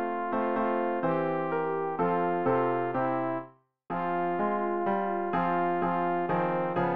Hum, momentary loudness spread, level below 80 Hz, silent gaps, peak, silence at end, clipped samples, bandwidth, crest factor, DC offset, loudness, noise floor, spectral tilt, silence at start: none; 3 LU; -66 dBFS; none; -14 dBFS; 0 s; under 0.1%; 4.8 kHz; 16 dB; 0.3%; -29 LUFS; -49 dBFS; -10 dB/octave; 0 s